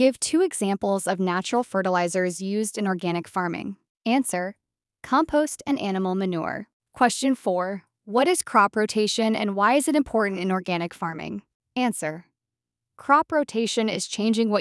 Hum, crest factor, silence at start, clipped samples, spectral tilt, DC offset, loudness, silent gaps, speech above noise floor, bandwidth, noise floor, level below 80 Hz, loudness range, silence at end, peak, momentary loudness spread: none; 20 dB; 0 s; under 0.1%; -4.5 dB/octave; under 0.1%; -24 LUFS; 3.89-3.95 s, 6.73-6.80 s, 11.55-11.60 s; 64 dB; 12 kHz; -88 dBFS; -62 dBFS; 4 LU; 0 s; -4 dBFS; 11 LU